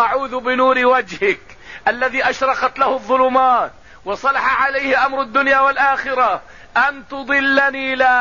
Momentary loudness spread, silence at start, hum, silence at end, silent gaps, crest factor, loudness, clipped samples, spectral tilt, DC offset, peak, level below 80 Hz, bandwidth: 8 LU; 0 s; none; 0 s; none; 14 dB; -16 LUFS; under 0.1%; -3.5 dB/octave; 0.5%; -4 dBFS; -50 dBFS; 7.4 kHz